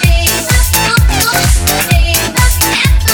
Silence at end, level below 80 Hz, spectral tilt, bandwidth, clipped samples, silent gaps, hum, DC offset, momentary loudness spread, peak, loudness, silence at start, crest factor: 0 s; -14 dBFS; -3 dB/octave; over 20 kHz; under 0.1%; none; none; under 0.1%; 2 LU; 0 dBFS; -10 LUFS; 0 s; 10 dB